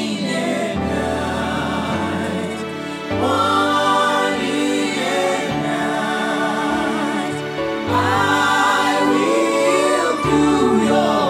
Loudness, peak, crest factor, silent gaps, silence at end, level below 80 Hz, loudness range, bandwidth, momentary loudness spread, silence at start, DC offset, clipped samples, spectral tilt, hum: -18 LUFS; -2 dBFS; 16 dB; none; 0 s; -46 dBFS; 4 LU; 15.5 kHz; 7 LU; 0 s; under 0.1%; under 0.1%; -4.5 dB/octave; none